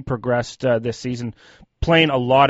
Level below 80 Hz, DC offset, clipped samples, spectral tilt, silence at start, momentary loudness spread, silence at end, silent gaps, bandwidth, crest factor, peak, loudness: -40 dBFS; under 0.1%; under 0.1%; -4 dB/octave; 0 s; 12 LU; 0 s; none; 8 kHz; 18 dB; -2 dBFS; -20 LUFS